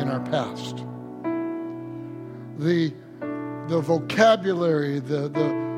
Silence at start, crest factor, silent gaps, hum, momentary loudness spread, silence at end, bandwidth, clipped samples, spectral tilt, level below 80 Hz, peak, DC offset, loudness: 0 s; 20 dB; none; none; 17 LU; 0 s; 13 kHz; under 0.1%; -6.5 dB/octave; -68 dBFS; -4 dBFS; under 0.1%; -25 LUFS